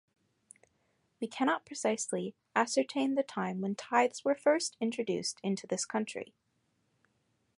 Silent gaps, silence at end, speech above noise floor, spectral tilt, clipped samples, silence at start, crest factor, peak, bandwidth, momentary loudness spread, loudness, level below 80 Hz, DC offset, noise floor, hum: none; 1.35 s; 44 dB; -4 dB/octave; under 0.1%; 1.2 s; 22 dB; -12 dBFS; 11.5 kHz; 9 LU; -33 LUFS; -82 dBFS; under 0.1%; -77 dBFS; none